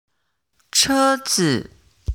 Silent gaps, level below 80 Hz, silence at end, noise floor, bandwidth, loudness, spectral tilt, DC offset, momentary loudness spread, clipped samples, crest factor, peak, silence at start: none; -36 dBFS; 0 s; -73 dBFS; 18.5 kHz; -18 LUFS; -3 dB/octave; under 0.1%; 9 LU; under 0.1%; 18 dB; -2 dBFS; 0.75 s